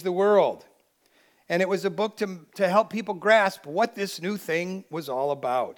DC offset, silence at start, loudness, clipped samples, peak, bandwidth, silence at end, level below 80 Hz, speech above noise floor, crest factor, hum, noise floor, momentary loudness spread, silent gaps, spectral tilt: under 0.1%; 0 s; -25 LUFS; under 0.1%; -6 dBFS; 19 kHz; 0.05 s; -84 dBFS; 39 dB; 20 dB; none; -64 dBFS; 12 LU; none; -5 dB/octave